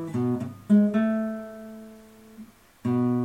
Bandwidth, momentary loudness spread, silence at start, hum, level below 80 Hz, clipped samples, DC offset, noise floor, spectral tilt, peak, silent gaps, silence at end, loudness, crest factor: 9.2 kHz; 23 LU; 0 s; none; -66 dBFS; under 0.1%; under 0.1%; -49 dBFS; -9 dB/octave; -10 dBFS; none; 0 s; -25 LUFS; 16 dB